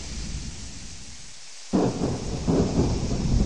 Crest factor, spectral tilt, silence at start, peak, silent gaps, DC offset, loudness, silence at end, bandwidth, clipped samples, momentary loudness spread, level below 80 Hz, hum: 18 dB; -6 dB/octave; 0 s; -10 dBFS; none; 0.9%; -26 LUFS; 0 s; 11 kHz; under 0.1%; 17 LU; -32 dBFS; none